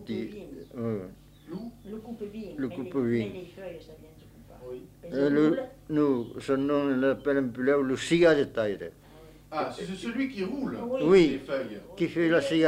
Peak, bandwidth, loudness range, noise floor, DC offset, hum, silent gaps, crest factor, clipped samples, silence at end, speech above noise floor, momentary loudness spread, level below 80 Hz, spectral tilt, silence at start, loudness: -8 dBFS; 15.5 kHz; 9 LU; -50 dBFS; under 0.1%; 50 Hz at -70 dBFS; none; 20 dB; under 0.1%; 0 s; 23 dB; 20 LU; -58 dBFS; -6.5 dB/octave; 0 s; -27 LUFS